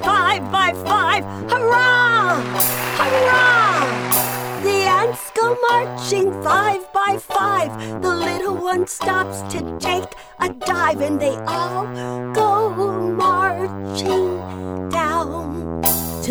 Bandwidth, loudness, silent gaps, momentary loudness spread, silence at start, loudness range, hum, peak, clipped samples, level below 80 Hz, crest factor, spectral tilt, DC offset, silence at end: over 20 kHz; -18 LUFS; none; 10 LU; 0 s; 6 LU; none; -2 dBFS; under 0.1%; -48 dBFS; 16 dB; -3.5 dB/octave; under 0.1%; 0 s